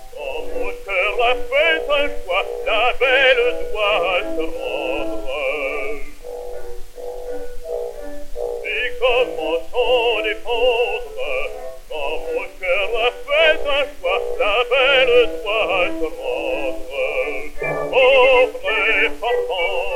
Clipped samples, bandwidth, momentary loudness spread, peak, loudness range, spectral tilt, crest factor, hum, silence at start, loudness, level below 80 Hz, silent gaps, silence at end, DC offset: under 0.1%; 16 kHz; 16 LU; -2 dBFS; 9 LU; -3 dB/octave; 16 dB; none; 0 s; -19 LUFS; -36 dBFS; none; 0 s; under 0.1%